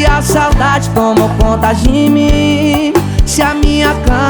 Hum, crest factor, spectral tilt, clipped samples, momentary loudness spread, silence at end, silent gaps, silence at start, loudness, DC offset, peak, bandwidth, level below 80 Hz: none; 10 dB; -5.5 dB/octave; under 0.1%; 2 LU; 0 s; none; 0 s; -10 LUFS; under 0.1%; 0 dBFS; over 20 kHz; -16 dBFS